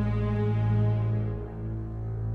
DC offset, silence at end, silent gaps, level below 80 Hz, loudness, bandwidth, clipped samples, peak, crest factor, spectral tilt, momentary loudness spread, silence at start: under 0.1%; 0 s; none; -38 dBFS; -29 LUFS; 4.1 kHz; under 0.1%; -16 dBFS; 12 dB; -10.5 dB/octave; 10 LU; 0 s